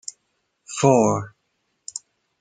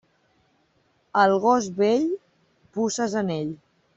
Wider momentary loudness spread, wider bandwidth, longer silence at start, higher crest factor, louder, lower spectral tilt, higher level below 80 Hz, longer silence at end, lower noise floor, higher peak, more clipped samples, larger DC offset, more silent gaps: first, 22 LU vs 15 LU; first, 9.6 kHz vs 8.2 kHz; second, 0.7 s vs 1.15 s; about the same, 22 dB vs 20 dB; first, -19 LUFS vs -23 LUFS; about the same, -5.5 dB/octave vs -5 dB/octave; first, -62 dBFS vs -68 dBFS; about the same, 0.4 s vs 0.4 s; first, -72 dBFS vs -66 dBFS; first, -2 dBFS vs -6 dBFS; neither; neither; neither